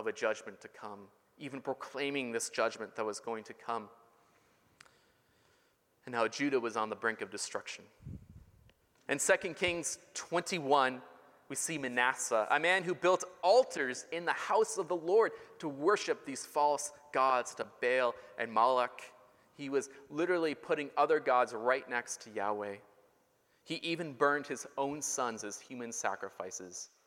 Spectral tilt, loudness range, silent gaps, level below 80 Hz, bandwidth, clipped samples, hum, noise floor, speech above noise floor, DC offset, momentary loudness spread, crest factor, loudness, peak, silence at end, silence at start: -3 dB/octave; 8 LU; none; -74 dBFS; 16.5 kHz; under 0.1%; none; -72 dBFS; 38 dB; under 0.1%; 14 LU; 22 dB; -34 LUFS; -14 dBFS; 0.2 s; 0 s